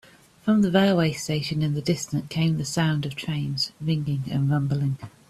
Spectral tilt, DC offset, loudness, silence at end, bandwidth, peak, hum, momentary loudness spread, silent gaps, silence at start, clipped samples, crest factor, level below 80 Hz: -6 dB/octave; under 0.1%; -24 LUFS; 0.2 s; 13.5 kHz; -8 dBFS; none; 8 LU; none; 0.45 s; under 0.1%; 16 dB; -56 dBFS